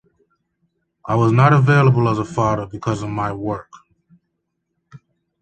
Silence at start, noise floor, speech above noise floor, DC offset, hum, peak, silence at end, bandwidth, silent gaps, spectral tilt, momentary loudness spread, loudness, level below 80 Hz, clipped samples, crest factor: 1.05 s; -75 dBFS; 58 dB; under 0.1%; none; -2 dBFS; 0.45 s; 8.6 kHz; none; -8 dB/octave; 13 LU; -17 LUFS; -48 dBFS; under 0.1%; 18 dB